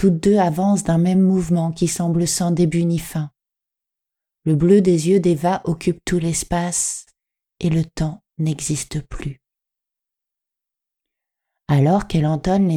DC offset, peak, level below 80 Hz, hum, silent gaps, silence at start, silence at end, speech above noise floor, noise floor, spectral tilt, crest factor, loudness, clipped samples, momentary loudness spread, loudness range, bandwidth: under 0.1%; -2 dBFS; -42 dBFS; none; none; 0 s; 0 s; 67 dB; -85 dBFS; -6 dB/octave; 16 dB; -19 LUFS; under 0.1%; 12 LU; 9 LU; 16 kHz